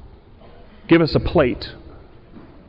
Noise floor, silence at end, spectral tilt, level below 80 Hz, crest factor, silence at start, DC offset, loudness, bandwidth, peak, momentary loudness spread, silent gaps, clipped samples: -44 dBFS; 0.25 s; -9.5 dB/octave; -38 dBFS; 16 dB; 0.05 s; under 0.1%; -18 LUFS; 5.6 kHz; -6 dBFS; 18 LU; none; under 0.1%